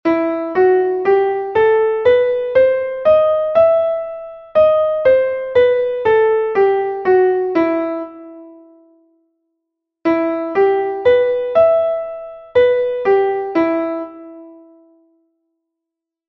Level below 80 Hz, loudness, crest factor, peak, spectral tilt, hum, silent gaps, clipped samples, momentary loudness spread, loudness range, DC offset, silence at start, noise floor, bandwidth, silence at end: -54 dBFS; -15 LUFS; 14 dB; -2 dBFS; -7.5 dB/octave; none; none; under 0.1%; 10 LU; 6 LU; under 0.1%; 0.05 s; -83 dBFS; 5.8 kHz; 1.75 s